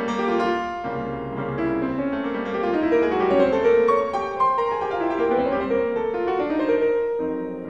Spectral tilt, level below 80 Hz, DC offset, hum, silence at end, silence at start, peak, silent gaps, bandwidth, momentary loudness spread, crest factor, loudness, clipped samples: -7 dB/octave; -50 dBFS; 0.2%; none; 0 s; 0 s; -8 dBFS; none; 7.4 kHz; 9 LU; 14 dB; -22 LUFS; under 0.1%